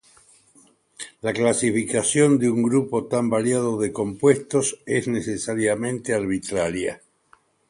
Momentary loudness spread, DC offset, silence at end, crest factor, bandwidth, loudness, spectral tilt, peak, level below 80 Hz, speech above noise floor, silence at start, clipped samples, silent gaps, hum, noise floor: 9 LU; under 0.1%; 0.75 s; 18 dB; 11.5 kHz; -22 LUFS; -5 dB/octave; -4 dBFS; -56 dBFS; 38 dB; 1 s; under 0.1%; none; none; -59 dBFS